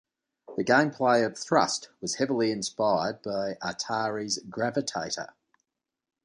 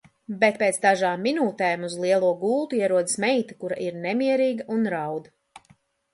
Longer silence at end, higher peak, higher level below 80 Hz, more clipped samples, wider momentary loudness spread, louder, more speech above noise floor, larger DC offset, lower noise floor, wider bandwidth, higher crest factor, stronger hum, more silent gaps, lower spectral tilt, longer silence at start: first, 1 s vs 0.55 s; second, -8 dBFS vs -4 dBFS; about the same, -68 dBFS vs -72 dBFS; neither; about the same, 9 LU vs 9 LU; second, -28 LUFS vs -24 LUFS; first, 60 dB vs 37 dB; neither; first, -87 dBFS vs -60 dBFS; about the same, 11 kHz vs 11.5 kHz; about the same, 22 dB vs 20 dB; neither; neither; about the same, -3.5 dB/octave vs -4 dB/octave; first, 0.5 s vs 0.3 s